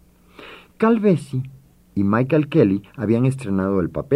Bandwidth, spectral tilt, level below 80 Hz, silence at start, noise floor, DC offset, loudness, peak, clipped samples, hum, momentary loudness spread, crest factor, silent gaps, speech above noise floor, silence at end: 12 kHz; -8.5 dB/octave; -52 dBFS; 0.4 s; -44 dBFS; under 0.1%; -20 LUFS; -2 dBFS; under 0.1%; none; 13 LU; 18 dB; none; 26 dB; 0 s